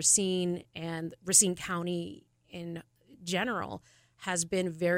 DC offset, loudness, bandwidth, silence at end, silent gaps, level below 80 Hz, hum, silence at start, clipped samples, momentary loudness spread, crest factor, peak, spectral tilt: under 0.1%; -29 LUFS; 16 kHz; 0 s; none; -66 dBFS; none; 0 s; under 0.1%; 21 LU; 22 dB; -8 dBFS; -3 dB/octave